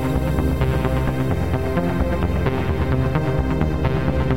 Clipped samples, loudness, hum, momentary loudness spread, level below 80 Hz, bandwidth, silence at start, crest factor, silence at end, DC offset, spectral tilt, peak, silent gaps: under 0.1%; -21 LUFS; none; 1 LU; -26 dBFS; 16 kHz; 0 s; 12 dB; 0 s; 2%; -8 dB/octave; -8 dBFS; none